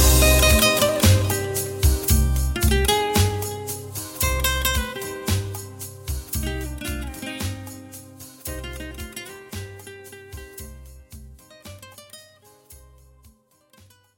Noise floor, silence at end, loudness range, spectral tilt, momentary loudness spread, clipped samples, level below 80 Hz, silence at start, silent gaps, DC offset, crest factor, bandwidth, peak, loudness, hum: -57 dBFS; 1.4 s; 22 LU; -3.5 dB/octave; 23 LU; under 0.1%; -28 dBFS; 0 s; none; under 0.1%; 18 dB; 17 kHz; -4 dBFS; -21 LUFS; none